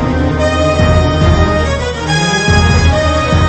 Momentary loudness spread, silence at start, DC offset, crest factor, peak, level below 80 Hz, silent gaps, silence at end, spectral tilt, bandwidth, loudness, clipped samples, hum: 4 LU; 0 s; under 0.1%; 10 dB; 0 dBFS; -18 dBFS; none; 0 s; -5.5 dB/octave; 8.8 kHz; -11 LUFS; under 0.1%; none